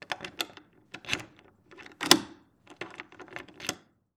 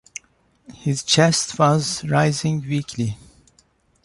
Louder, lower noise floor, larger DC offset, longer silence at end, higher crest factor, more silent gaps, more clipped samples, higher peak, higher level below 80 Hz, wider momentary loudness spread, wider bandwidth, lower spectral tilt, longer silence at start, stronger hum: second, -29 LUFS vs -20 LUFS; about the same, -57 dBFS vs -60 dBFS; neither; second, 0.4 s vs 0.9 s; first, 34 dB vs 18 dB; neither; neither; first, 0 dBFS vs -4 dBFS; second, -68 dBFS vs -54 dBFS; first, 26 LU vs 15 LU; first, over 20 kHz vs 11.5 kHz; second, -1.5 dB/octave vs -4.5 dB/octave; second, 0 s vs 0.7 s; neither